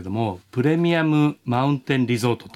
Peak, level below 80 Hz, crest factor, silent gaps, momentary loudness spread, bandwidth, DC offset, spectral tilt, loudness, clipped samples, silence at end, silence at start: -8 dBFS; -60 dBFS; 14 dB; none; 7 LU; 14 kHz; under 0.1%; -7 dB/octave; -21 LUFS; under 0.1%; 0.05 s; 0 s